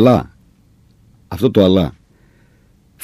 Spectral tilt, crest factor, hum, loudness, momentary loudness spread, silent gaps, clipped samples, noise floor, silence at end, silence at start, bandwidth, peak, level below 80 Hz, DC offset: -8 dB/octave; 18 dB; none; -15 LUFS; 19 LU; none; under 0.1%; -52 dBFS; 1.15 s; 0 s; 15.5 kHz; 0 dBFS; -42 dBFS; under 0.1%